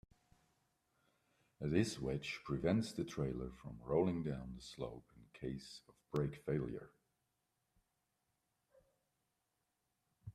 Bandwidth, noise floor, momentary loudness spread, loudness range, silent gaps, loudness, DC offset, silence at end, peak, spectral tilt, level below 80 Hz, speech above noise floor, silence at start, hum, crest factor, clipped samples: 13.5 kHz; -86 dBFS; 15 LU; 7 LU; none; -41 LUFS; under 0.1%; 0.05 s; -20 dBFS; -6.5 dB/octave; -64 dBFS; 46 dB; 1.6 s; none; 22 dB; under 0.1%